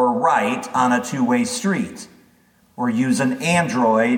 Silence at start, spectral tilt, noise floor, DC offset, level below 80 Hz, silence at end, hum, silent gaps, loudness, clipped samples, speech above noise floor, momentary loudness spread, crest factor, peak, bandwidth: 0 s; -5 dB/octave; -56 dBFS; under 0.1%; -64 dBFS; 0 s; none; none; -19 LUFS; under 0.1%; 38 dB; 7 LU; 16 dB; -4 dBFS; 16.5 kHz